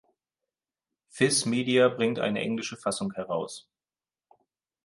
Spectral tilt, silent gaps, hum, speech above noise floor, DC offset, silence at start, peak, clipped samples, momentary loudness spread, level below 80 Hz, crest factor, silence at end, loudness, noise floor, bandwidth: -4 dB/octave; none; none; over 63 dB; under 0.1%; 1.15 s; -10 dBFS; under 0.1%; 10 LU; -72 dBFS; 20 dB; 1.25 s; -27 LUFS; under -90 dBFS; 11.5 kHz